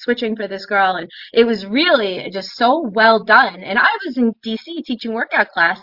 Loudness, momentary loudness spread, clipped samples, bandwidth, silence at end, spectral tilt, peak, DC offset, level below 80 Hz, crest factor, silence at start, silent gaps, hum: -16 LUFS; 13 LU; under 0.1%; 5.8 kHz; 0.05 s; -5.5 dB/octave; 0 dBFS; under 0.1%; -62 dBFS; 16 dB; 0 s; none; none